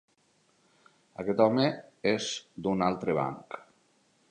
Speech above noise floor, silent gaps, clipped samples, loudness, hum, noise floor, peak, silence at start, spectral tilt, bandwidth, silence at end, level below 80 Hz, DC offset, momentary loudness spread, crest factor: 40 dB; none; under 0.1%; -29 LUFS; none; -69 dBFS; -8 dBFS; 1.2 s; -5.5 dB/octave; 9.8 kHz; 0.7 s; -66 dBFS; under 0.1%; 19 LU; 22 dB